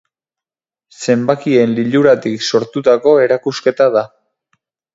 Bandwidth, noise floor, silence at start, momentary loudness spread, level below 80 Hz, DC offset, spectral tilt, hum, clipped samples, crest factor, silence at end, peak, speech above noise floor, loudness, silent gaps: 7.8 kHz; -89 dBFS; 1 s; 6 LU; -62 dBFS; under 0.1%; -5.5 dB/octave; none; under 0.1%; 14 dB; 0.9 s; 0 dBFS; 77 dB; -13 LUFS; none